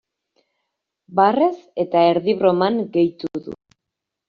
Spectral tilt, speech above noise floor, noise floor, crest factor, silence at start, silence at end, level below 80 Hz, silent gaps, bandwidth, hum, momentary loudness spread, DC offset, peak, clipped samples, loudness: -5 dB/octave; 65 dB; -83 dBFS; 18 dB; 1.1 s; 0.75 s; -64 dBFS; none; 5.2 kHz; none; 13 LU; under 0.1%; -4 dBFS; under 0.1%; -19 LUFS